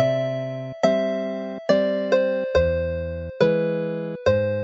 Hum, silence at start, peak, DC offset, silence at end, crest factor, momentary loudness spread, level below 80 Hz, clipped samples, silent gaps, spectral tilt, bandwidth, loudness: none; 0 s; -4 dBFS; under 0.1%; 0 s; 18 dB; 8 LU; -42 dBFS; under 0.1%; none; -7 dB/octave; 7.8 kHz; -23 LUFS